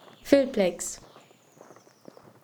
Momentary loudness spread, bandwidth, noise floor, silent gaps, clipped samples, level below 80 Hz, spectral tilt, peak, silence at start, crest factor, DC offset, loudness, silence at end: 14 LU; over 20 kHz; -55 dBFS; none; under 0.1%; -62 dBFS; -4.5 dB/octave; -6 dBFS; 0.25 s; 24 dB; under 0.1%; -25 LUFS; 1.45 s